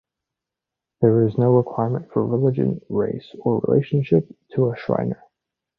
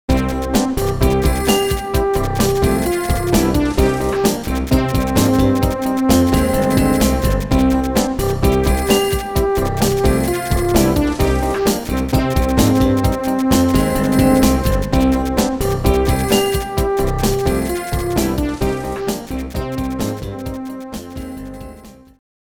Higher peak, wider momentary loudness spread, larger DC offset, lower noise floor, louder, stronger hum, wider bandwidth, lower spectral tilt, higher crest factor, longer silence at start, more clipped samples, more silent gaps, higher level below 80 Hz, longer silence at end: about the same, -2 dBFS vs 0 dBFS; about the same, 8 LU vs 9 LU; neither; first, -86 dBFS vs -39 dBFS; second, -21 LUFS vs -17 LUFS; neither; second, 5.2 kHz vs over 20 kHz; first, -11.5 dB/octave vs -5.5 dB/octave; about the same, 18 dB vs 16 dB; first, 1 s vs 0.1 s; neither; neither; second, -56 dBFS vs -24 dBFS; first, 0.65 s vs 0.45 s